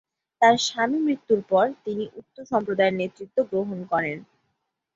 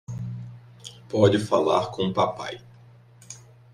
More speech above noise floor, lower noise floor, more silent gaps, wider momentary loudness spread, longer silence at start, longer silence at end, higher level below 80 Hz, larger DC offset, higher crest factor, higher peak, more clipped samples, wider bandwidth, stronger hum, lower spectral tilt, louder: first, 53 dB vs 28 dB; first, -77 dBFS vs -51 dBFS; neither; second, 12 LU vs 23 LU; first, 0.4 s vs 0.1 s; first, 0.7 s vs 0.35 s; second, -68 dBFS vs -62 dBFS; neither; about the same, 20 dB vs 20 dB; about the same, -6 dBFS vs -6 dBFS; neither; second, 7.8 kHz vs 13 kHz; neither; second, -4.5 dB/octave vs -6 dB/octave; about the same, -24 LUFS vs -24 LUFS